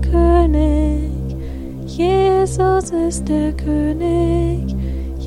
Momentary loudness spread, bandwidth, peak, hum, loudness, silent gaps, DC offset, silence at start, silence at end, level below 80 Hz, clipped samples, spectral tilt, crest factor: 12 LU; 11.5 kHz; -2 dBFS; none; -17 LUFS; none; under 0.1%; 0 s; 0 s; -22 dBFS; under 0.1%; -7.5 dB/octave; 14 dB